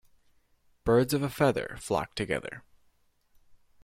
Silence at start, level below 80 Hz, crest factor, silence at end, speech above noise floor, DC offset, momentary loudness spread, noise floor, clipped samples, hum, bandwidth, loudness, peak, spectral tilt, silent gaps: 0.85 s; -54 dBFS; 20 dB; 1.25 s; 39 dB; under 0.1%; 11 LU; -67 dBFS; under 0.1%; none; 16.5 kHz; -29 LUFS; -10 dBFS; -5.5 dB/octave; none